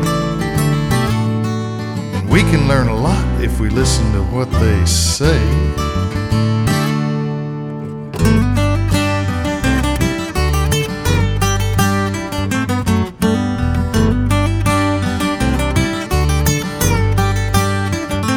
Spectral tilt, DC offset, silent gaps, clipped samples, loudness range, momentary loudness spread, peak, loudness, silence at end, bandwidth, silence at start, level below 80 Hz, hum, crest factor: -5.5 dB/octave; under 0.1%; none; under 0.1%; 2 LU; 5 LU; 0 dBFS; -16 LUFS; 0 s; 19.5 kHz; 0 s; -22 dBFS; none; 14 dB